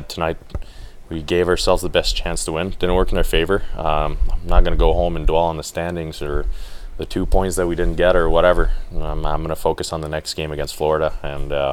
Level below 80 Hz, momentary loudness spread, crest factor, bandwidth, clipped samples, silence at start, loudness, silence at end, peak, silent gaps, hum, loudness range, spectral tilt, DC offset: -22 dBFS; 12 LU; 18 dB; 14.5 kHz; under 0.1%; 0 s; -20 LUFS; 0 s; 0 dBFS; none; none; 2 LU; -5 dB/octave; under 0.1%